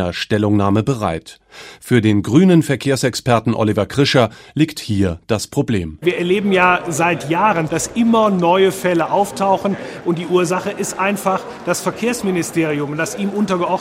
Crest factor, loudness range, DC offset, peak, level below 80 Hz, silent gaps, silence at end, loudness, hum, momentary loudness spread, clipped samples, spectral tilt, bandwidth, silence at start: 16 dB; 4 LU; under 0.1%; 0 dBFS; -50 dBFS; none; 0 s; -17 LUFS; none; 8 LU; under 0.1%; -5.5 dB/octave; 16 kHz; 0 s